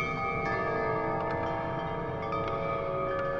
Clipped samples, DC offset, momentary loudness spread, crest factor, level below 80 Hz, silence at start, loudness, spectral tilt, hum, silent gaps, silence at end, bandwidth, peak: under 0.1%; under 0.1%; 3 LU; 12 dB; -50 dBFS; 0 s; -31 LUFS; -7.5 dB/octave; none; none; 0 s; 7.4 kHz; -18 dBFS